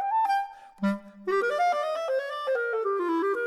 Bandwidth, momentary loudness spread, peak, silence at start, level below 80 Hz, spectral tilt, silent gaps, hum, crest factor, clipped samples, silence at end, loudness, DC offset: 13.5 kHz; 5 LU; -16 dBFS; 0 s; -74 dBFS; -6 dB/octave; none; none; 12 dB; under 0.1%; 0 s; -28 LUFS; under 0.1%